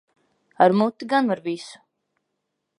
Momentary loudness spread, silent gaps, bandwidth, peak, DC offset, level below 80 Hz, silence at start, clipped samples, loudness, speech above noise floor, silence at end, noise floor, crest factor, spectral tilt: 15 LU; none; 11 kHz; -2 dBFS; under 0.1%; -76 dBFS; 0.6 s; under 0.1%; -21 LUFS; 57 dB; 1.05 s; -78 dBFS; 22 dB; -6.5 dB/octave